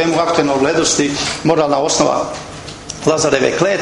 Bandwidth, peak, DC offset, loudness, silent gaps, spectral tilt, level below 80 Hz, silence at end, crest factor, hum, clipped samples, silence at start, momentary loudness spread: 11.5 kHz; 0 dBFS; under 0.1%; -15 LUFS; none; -3.5 dB/octave; -44 dBFS; 0 s; 16 dB; none; under 0.1%; 0 s; 13 LU